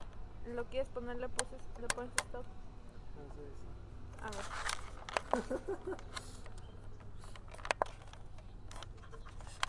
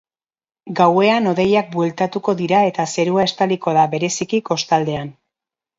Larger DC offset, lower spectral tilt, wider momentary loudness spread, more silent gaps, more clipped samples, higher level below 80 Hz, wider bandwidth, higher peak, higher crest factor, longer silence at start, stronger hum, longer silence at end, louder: neither; second, -3 dB/octave vs -5 dB/octave; first, 16 LU vs 6 LU; neither; neither; first, -50 dBFS vs -58 dBFS; first, 11.5 kHz vs 7.8 kHz; second, -12 dBFS vs 0 dBFS; first, 30 dB vs 18 dB; second, 0 s vs 0.65 s; neither; second, 0 s vs 0.65 s; second, -43 LUFS vs -17 LUFS